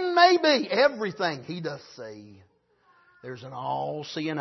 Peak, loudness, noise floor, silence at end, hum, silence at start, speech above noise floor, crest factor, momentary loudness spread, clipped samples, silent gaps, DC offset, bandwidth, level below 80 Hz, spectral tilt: -6 dBFS; -25 LUFS; -65 dBFS; 0 s; none; 0 s; 37 dB; 22 dB; 23 LU; under 0.1%; none; under 0.1%; 6.2 kHz; -74 dBFS; -4.5 dB/octave